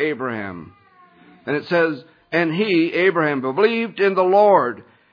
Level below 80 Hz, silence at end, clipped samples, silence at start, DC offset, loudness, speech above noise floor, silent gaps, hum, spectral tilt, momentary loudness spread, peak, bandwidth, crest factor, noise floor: -70 dBFS; 0.3 s; under 0.1%; 0 s; under 0.1%; -18 LUFS; 32 dB; none; none; -8 dB/octave; 17 LU; -2 dBFS; 5.2 kHz; 18 dB; -50 dBFS